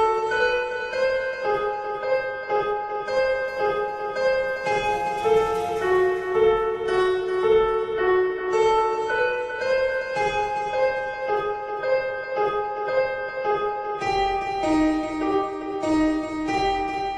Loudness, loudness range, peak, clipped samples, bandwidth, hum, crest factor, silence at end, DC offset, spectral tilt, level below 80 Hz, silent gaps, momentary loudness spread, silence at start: -24 LUFS; 3 LU; -8 dBFS; under 0.1%; 11.5 kHz; none; 14 dB; 0 s; under 0.1%; -5 dB/octave; -48 dBFS; none; 6 LU; 0 s